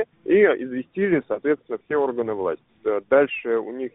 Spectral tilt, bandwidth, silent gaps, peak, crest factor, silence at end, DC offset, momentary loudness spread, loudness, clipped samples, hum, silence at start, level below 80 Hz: -2 dB/octave; 3.9 kHz; none; -6 dBFS; 18 dB; 0.05 s; under 0.1%; 9 LU; -22 LUFS; under 0.1%; none; 0 s; -64 dBFS